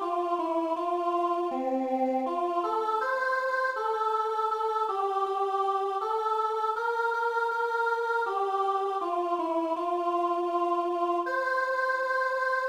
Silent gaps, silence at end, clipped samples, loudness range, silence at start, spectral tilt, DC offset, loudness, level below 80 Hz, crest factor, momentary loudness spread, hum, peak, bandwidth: none; 0 s; under 0.1%; 0 LU; 0 s; -3 dB/octave; under 0.1%; -28 LUFS; -74 dBFS; 12 dB; 2 LU; none; -16 dBFS; 15 kHz